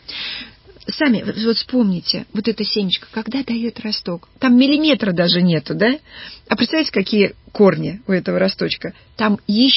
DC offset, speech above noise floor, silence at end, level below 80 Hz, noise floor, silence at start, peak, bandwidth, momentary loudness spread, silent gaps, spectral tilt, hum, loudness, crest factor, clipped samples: under 0.1%; 19 dB; 0 s; -52 dBFS; -37 dBFS; 0.1 s; 0 dBFS; 5.8 kHz; 11 LU; none; -9 dB/octave; none; -18 LUFS; 16 dB; under 0.1%